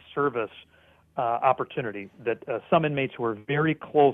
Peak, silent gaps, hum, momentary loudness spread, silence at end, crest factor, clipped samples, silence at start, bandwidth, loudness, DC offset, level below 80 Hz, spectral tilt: -8 dBFS; none; none; 9 LU; 0 s; 18 dB; under 0.1%; 0.1 s; 3.9 kHz; -27 LUFS; under 0.1%; -64 dBFS; -9.5 dB/octave